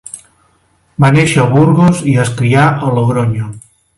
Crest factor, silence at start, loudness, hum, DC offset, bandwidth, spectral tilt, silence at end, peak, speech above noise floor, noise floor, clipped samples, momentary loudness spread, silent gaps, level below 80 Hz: 12 dB; 0.15 s; -11 LUFS; none; under 0.1%; 11.5 kHz; -6.5 dB/octave; 0.4 s; 0 dBFS; 45 dB; -54 dBFS; under 0.1%; 17 LU; none; -44 dBFS